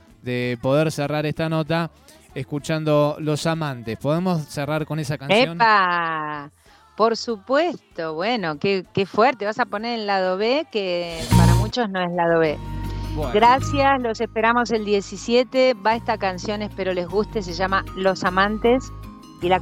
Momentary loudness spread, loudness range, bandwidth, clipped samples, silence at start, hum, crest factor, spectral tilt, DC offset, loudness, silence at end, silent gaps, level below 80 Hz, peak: 11 LU; 4 LU; 16.5 kHz; under 0.1%; 0.25 s; none; 18 dB; -5.5 dB/octave; under 0.1%; -21 LUFS; 0 s; none; -38 dBFS; -4 dBFS